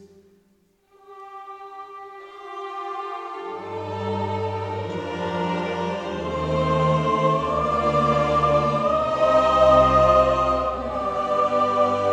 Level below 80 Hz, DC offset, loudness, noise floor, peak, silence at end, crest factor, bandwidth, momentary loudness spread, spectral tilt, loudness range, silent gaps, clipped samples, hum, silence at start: -42 dBFS; under 0.1%; -21 LUFS; -62 dBFS; -4 dBFS; 0 s; 18 dB; 9.4 kHz; 22 LU; -6.5 dB/octave; 16 LU; none; under 0.1%; none; 0 s